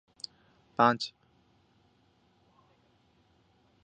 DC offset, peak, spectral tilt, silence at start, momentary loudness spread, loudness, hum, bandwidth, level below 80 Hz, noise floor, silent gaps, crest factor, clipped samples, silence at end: under 0.1%; -8 dBFS; -5 dB/octave; 0.8 s; 19 LU; -30 LUFS; none; 8.8 kHz; -76 dBFS; -68 dBFS; none; 28 dB; under 0.1%; 2.75 s